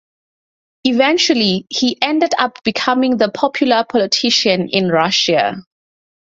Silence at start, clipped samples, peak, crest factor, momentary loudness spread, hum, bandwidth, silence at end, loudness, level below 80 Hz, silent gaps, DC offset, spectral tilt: 0.85 s; under 0.1%; 0 dBFS; 16 dB; 5 LU; none; 7.8 kHz; 0.65 s; -15 LUFS; -58 dBFS; none; under 0.1%; -3.5 dB/octave